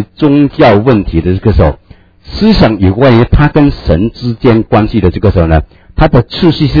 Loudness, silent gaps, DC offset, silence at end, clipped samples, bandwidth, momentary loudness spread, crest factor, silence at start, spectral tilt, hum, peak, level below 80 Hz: -8 LUFS; none; under 0.1%; 0 s; 3%; 5.4 kHz; 6 LU; 8 dB; 0 s; -9 dB/octave; none; 0 dBFS; -20 dBFS